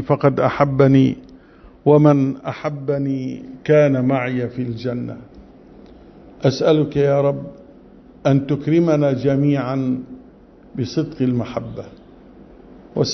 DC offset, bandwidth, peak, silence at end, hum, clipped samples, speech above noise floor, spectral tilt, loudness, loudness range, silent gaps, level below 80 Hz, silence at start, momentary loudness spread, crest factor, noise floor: under 0.1%; 6.4 kHz; -2 dBFS; 0 s; none; under 0.1%; 28 dB; -8 dB/octave; -18 LUFS; 5 LU; none; -50 dBFS; 0 s; 16 LU; 18 dB; -45 dBFS